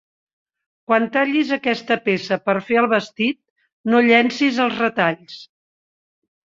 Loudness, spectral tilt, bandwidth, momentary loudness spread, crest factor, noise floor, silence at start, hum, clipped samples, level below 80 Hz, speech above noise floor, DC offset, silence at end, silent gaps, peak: -18 LUFS; -5.5 dB/octave; 7.6 kHz; 11 LU; 20 dB; under -90 dBFS; 0.9 s; none; under 0.1%; -66 dBFS; over 72 dB; under 0.1%; 1.15 s; 3.50-3.56 s, 3.73-3.84 s; -2 dBFS